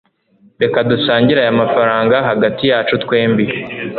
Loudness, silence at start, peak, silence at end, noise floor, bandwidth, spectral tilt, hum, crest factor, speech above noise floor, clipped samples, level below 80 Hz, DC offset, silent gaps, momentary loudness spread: -14 LUFS; 0.6 s; 0 dBFS; 0 s; -52 dBFS; 4.6 kHz; -9.5 dB/octave; none; 14 dB; 39 dB; under 0.1%; -50 dBFS; under 0.1%; none; 5 LU